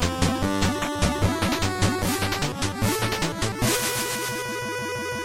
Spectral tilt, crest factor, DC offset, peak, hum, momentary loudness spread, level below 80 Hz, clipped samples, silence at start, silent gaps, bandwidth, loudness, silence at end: -4 dB/octave; 16 dB; under 0.1%; -8 dBFS; none; 5 LU; -38 dBFS; under 0.1%; 0 s; none; 16.5 kHz; -24 LUFS; 0 s